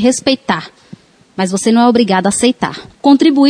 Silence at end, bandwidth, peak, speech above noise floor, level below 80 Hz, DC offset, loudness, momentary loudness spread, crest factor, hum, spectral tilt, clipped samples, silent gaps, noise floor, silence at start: 0 s; 11 kHz; 0 dBFS; 28 dB; -52 dBFS; under 0.1%; -13 LUFS; 10 LU; 12 dB; none; -4.5 dB/octave; under 0.1%; none; -39 dBFS; 0 s